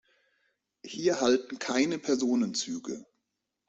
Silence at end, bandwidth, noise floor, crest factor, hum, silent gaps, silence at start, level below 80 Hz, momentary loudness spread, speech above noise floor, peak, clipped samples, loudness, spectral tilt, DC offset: 0.65 s; 8.2 kHz; -83 dBFS; 20 dB; none; none; 0.85 s; -72 dBFS; 13 LU; 55 dB; -12 dBFS; under 0.1%; -29 LUFS; -3.5 dB/octave; under 0.1%